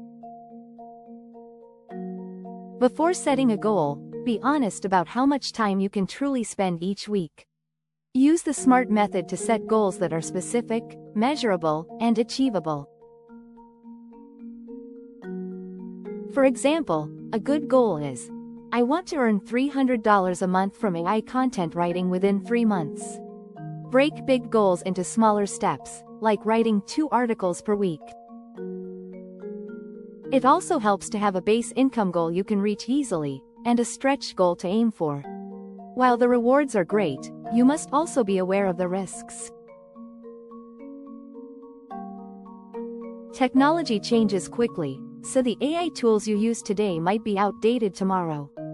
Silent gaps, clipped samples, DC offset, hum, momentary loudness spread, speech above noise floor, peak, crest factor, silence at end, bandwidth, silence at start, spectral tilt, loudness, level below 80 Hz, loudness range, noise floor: none; under 0.1%; under 0.1%; none; 20 LU; 61 dB; -6 dBFS; 20 dB; 0 s; 12 kHz; 0 s; -5.5 dB/octave; -24 LUFS; -64 dBFS; 6 LU; -84 dBFS